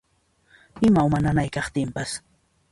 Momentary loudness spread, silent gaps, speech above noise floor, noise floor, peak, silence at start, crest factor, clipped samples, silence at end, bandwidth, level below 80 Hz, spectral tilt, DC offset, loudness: 12 LU; none; 43 dB; -65 dBFS; -8 dBFS; 0.75 s; 16 dB; under 0.1%; 0.55 s; 11.5 kHz; -44 dBFS; -6.5 dB/octave; under 0.1%; -23 LUFS